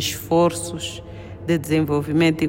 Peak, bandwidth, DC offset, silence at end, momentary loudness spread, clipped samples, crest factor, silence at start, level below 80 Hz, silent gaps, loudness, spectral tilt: -6 dBFS; 16.5 kHz; under 0.1%; 0 s; 13 LU; under 0.1%; 14 dB; 0 s; -48 dBFS; none; -21 LUFS; -5 dB/octave